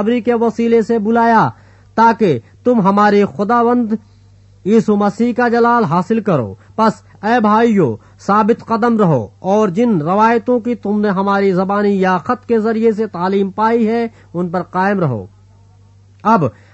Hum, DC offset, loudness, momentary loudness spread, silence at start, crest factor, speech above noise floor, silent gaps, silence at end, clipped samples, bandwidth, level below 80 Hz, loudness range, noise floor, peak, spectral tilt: none; under 0.1%; -14 LUFS; 7 LU; 0 s; 14 dB; 32 dB; none; 0.25 s; under 0.1%; 8.2 kHz; -54 dBFS; 3 LU; -45 dBFS; 0 dBFS; -8 dB/octave